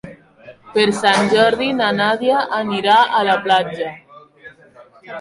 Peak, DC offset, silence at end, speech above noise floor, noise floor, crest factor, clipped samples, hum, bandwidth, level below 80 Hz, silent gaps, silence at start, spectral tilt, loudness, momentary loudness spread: -2 dBFS; under 0.1%; 0 s; 30 dB; -46 dBFS; 16 dB; under 0.1%; none; 11.5 kHz; -58 dBFS; none; 0.05 s; -4 dB/octave; -16 LUFS; 11 LU